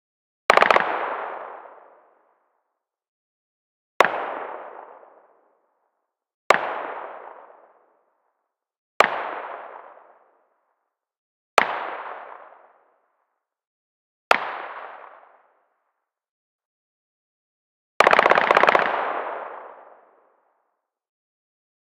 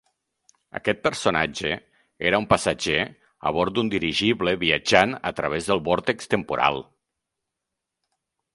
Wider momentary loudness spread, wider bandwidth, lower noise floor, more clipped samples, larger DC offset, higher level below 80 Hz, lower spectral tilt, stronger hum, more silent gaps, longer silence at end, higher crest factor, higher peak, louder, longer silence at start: first, 25 LU vs 9 LU; first, 14 kHz vs 11.5 kHz; second, -80 dBFS vs -84 dBFS; neither; neither; second, -68 dBFS vs -52 dBFS; second, -2.5 dB/octave vs -4 dB/octave; neither; first, 3.08-4.00 s, 6.34-6.50 s, 8.78-9.00 s, 11.18-11.57 s, 13.67-14.31 s, 16.29-16.59 s, 16.65-18.00 s vs none; first, 2.25 s vs 1.7 s; about the same, 26 dB vs 24 dB; about the same, 0 dBFS vs 0 dBFS; about the same, -21 LUFS vs -23 LUFS; second, 0.5 s vs 0.75 s